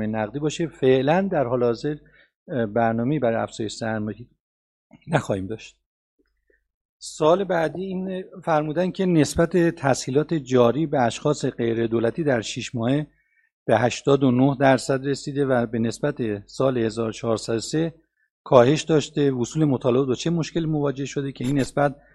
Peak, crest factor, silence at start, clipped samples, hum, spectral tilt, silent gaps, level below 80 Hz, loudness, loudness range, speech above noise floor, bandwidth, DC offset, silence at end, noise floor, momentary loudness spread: 0 dBFS; 22 dB; 0 s; under 0.1%; none; -6 dB/octave; 2.36-2.46 s, 4.40-4.90 s, 5.86-6.18 s, 6.74-7.00 s, 13.52-13.66 s, 18.31-18.44 s; -52 dBFS; -23 LUFS; 5 LU; 45 dB; 12.5 kHz; under 0.1%; 0.2 s; -67 dBFS; 10 LU